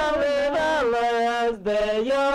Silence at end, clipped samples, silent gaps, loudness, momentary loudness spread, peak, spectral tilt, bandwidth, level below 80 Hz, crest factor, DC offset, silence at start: 0 s; under 0.1%; none; -23 LUFS; 2 LU; -14 dBFS; -4 dB/octave; 13 kHz; -48 dBFS; 8 dB; under 0.1%; 0 s